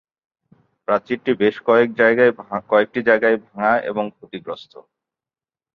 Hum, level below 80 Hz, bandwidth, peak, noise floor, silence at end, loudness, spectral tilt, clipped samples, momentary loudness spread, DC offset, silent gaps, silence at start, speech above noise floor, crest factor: none; -64 dBFS; 6 kHz; -2 dBFS; under -90 dBFS; 1.15 s; -18 LUFS; -7.5 dB/octave; under 0.1%; 17 LU; under 0.1%; none; 0.9 s; over 72 dB; 18 dB